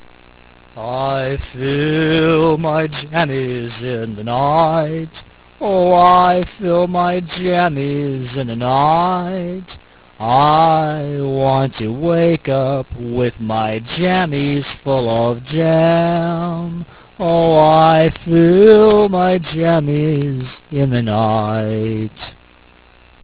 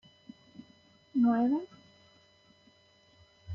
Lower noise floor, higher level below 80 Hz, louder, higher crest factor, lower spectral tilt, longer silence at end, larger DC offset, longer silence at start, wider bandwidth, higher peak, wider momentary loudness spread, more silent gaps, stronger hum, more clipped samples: second, -47 dBFS vs -64 dBFS; first, -42 dBFS vs -68 dBFS; first, -15 LUFS vs -29 LUFS; about the same, 16 dB vs 16 dB; first, -11 dB/octave vs -8.5 dB/octave; first, 0.9 s vs 0 s; neither; first, 0.75 s vs 0.6 s; second, 4 kHz vs 5.2 kHz; first, 0 dBFS vs -18 dBFS; second, 13 LU vs 28 LU; neither; neither; neither